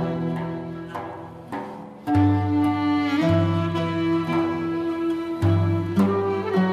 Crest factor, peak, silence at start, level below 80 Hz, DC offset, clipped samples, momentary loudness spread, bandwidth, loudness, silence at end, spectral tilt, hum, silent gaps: 14 dB; -8 dBFS; 0 s; -54 dBFS; under 0.1%; under 0.1%; 13 LU; 12 kHz; -23 LUFS; 0 s; -8.5 dB/octave; none; none